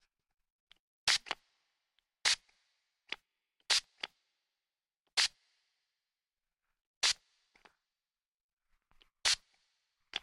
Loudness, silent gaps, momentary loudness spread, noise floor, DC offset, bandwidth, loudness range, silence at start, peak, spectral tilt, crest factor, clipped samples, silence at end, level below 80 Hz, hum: -33 LUFS; 6.87-7.01 s, 8.28-8.57 s; 15 LU; under -90 dBFS; under 0.1%; 15.5 kHz; 4 LU; 1.05 s; -12 dBFS; 3 dB/octave; 28 dB; under 0.1%; 0.05 s; -74 dBFS; none